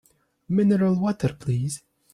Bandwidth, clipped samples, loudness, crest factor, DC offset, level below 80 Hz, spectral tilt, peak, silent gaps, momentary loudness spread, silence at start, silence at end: 12.5 kHz; under 0.1%; -24 LUFS; 14 dB; under 0.1%; -56 dBFS; -7.5 dB/octave; -10 dBFS; none; 9 LU; 0.5 s; 0.35 s